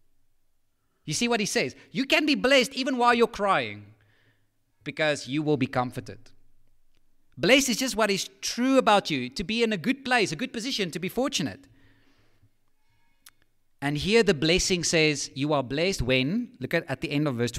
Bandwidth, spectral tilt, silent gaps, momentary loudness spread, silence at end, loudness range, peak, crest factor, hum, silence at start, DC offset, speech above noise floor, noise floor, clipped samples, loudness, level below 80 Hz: 16 kHz; -3.5 dB/octave; none; 10 LU; 0 s; 7 LU; -6 dBFS; 20 dB; none; 1.05 s; under 0.1%; 43 dB; -69 dBFS; under 0.1%; -25 LUFS; -50 dBFS